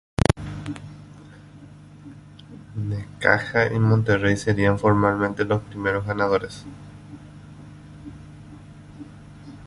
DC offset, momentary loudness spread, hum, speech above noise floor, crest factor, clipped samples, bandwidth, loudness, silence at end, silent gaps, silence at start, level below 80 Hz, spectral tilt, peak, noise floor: under 0.1%; 24 LU; 50 Hz at -35 dBFS; 23 dB; 24 dB; under 0.1%; 11.5 kHz; -22 LUFS; 0 s; none; 0.3 s; -44 dBFS; -7 dB/octave; -2 dBFS; -45 dBFS